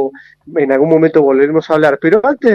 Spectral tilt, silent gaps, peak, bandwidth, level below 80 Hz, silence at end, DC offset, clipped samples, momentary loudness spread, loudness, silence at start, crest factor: -8 dB/octave; none; 0 dBFS; 7 kHz; -56 dBFS; 0 s; under 0.1%; under 0.1%; 7 LU; -12 LUFS; 0 s; 12 dB